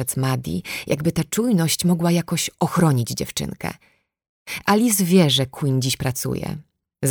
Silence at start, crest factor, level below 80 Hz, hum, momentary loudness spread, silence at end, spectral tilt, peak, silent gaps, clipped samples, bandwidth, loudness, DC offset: 0 s; 18 dB; -50 dBFS; none; 12 LU; 0 s; -5 dB/octave; -4 dBFS; 4.29-4.46 s; under 0.1%; over 20 kHz; -20 LUFS; under 0.1%